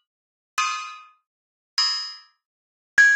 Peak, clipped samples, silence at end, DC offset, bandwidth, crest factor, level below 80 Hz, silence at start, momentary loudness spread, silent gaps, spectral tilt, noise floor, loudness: -6 dBFS; under 0.1%; 0 s; under 0.1%; 16 kHz; 20 dB; -72 dBFS; 0.55 s; 19 LU; 1.27-1.77 s, 2.45-2.97 s; 4 dB/octave; under -90 dBFS; -23 LUFS